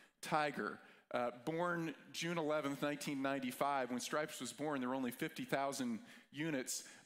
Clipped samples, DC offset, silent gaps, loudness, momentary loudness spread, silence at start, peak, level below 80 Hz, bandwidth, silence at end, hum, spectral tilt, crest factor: under 0.1%; under 0.1%; none; -41 LUFS; 6 LU; 0 s; -20 dBFS; -84 dBFS; 16 kHz; 0.05 s; none; -4 dB/octave; 20 dB